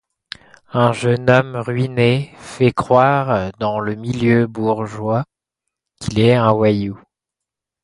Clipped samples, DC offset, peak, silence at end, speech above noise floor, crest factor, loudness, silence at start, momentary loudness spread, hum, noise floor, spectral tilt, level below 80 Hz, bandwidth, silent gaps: under 0.1%; under 0.1%; 0 dBFS; 0.85 s; 68 dB; 18 dB; -17 LUFS; 0.75 s; 15 LU; none; -84 dBFS; -7 dB/octave; -48 dBFS; 11.5 kHz; none